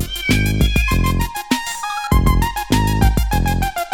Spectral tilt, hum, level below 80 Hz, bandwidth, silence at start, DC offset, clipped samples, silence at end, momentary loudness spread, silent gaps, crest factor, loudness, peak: -5 dB/octave; none; -20 dBFS; 18.5 kHz; 0 s; under 0.1%; under 0.1%; 0 s; 5 LU; none; 16 dB; -18 LUFS; 0 dBFS